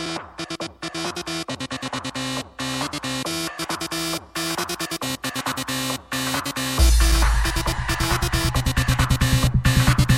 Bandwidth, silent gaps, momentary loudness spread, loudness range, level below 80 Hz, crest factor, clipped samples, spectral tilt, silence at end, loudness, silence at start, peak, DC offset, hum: 17 kHz; none; 10 LU; 7 LU; -26 dBFS; 20 dB; under 0.1%; -4 dB/octave; 0 s; -23 LUFS; 0 s; -2 dBFS; under 0.1%; none